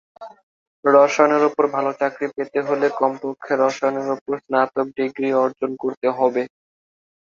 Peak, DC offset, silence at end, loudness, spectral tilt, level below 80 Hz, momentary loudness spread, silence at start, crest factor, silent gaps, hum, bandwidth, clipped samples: -2 dBFS; under 0.1%; 0.8 s; -20 LUFS; -5.5 dB/octave; -70 dBFS; 10 LU; 0.2 s; 18 dB; 0.43-0.83 s, 4.21-4.26 s, 5.97-6.01 s; none; 7.4 kHz; under 0.1%